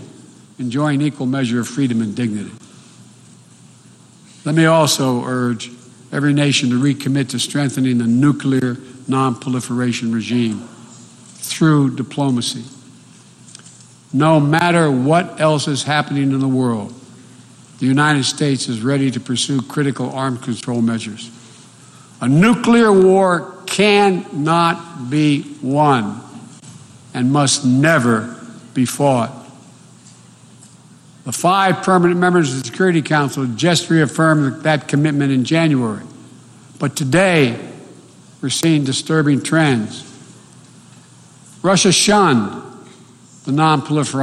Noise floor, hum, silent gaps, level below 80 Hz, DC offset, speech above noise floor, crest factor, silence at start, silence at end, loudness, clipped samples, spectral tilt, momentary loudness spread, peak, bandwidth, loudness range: -45 dBFS; none; none; -58 dBFS; under 0.1%; 30 dB; 14 dB; 0 s; 0 s; -16 LUFS; under 0.1%; -5 dB/octave; 14 LU; -2 dBFS; 13.5 kHz; 6 LU